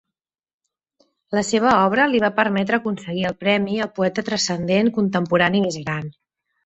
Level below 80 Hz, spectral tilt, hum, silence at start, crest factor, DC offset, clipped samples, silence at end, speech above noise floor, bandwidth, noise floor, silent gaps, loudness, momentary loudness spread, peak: -58 dBFS; -5 dB/octave; none; 1.3 s; 20 dB; under 0.1%; under 0.1%; 0.55 s; 66 dB; 8.2 kHz; -86 dBFS; none; -20 LUFS; 9 LU; -2 dBFS